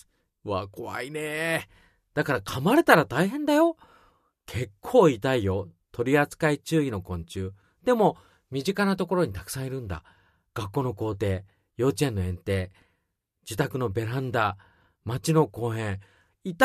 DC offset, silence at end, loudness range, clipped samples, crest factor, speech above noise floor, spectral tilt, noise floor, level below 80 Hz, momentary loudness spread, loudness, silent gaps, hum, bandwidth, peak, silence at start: under 0.1%; 0 s; 6 LU; under 0.1%; 26 dB; 52 dB; -6 dB/octave; -77 dBFS; -54 dBFS; 16 LU; -26 LUFS; none; none; 14 kHz; 0 dBFS; 0.45 s